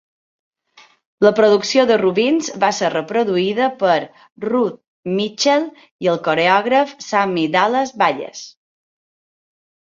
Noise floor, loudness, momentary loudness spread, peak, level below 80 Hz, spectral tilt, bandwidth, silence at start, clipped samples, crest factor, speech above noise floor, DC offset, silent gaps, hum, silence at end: -51 dBFS; -17 LUFS; 10 LU; 0 dBFS; -64 dBFS; -4 dB/octave; 7.6 kHz; 1.2 s; under 0.1%; 18 dB; 34 dB; under 0.1%; 4.32-4.36 s, 4.88-5.03 s, 5.91-5.99 s; none; 1.4 s